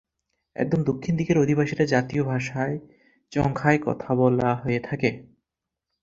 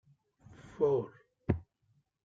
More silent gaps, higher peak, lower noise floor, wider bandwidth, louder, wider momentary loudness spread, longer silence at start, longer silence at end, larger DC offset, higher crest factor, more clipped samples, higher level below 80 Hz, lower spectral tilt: neither; first, -4 dBFS vs -14 dBFS; first, -85 dBFS vs -74 dBFS; about the same, 7.6 kHz vs 7.6 kHz; first, -24 LUFS vs -34 LUFS; second, 8 LU vs 16 LU; about the same, 0.6 s vs 0.65 s; first, 0.8 s vs 0.65 s; neither; about the same, 20 dB vs 24 dB; neither; first, -52 dBFS vs -58 dBFS; second, -7.5 dB/octave vs -9.5 dB/octave